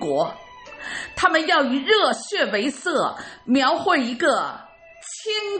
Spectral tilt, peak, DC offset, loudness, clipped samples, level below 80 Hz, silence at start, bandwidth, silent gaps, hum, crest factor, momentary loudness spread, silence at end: -3 dB/octave; -2 dBFS; under 0.1%; -21 LUFS; under 0.1%; -60 dBFS; 0 s; 8.8 kHz; none; none; 20 dB; 18 LU; 0 s